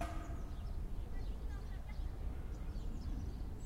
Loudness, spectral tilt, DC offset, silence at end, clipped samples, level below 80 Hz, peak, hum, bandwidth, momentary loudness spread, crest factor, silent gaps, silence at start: -47 LUFS; -7 dB/octave; under 0.1%; 0 s; under 0.1%; -42 dBFS; -28 dBFS; none; 15 kHz; 2 LU; 14 dB; none; 0 s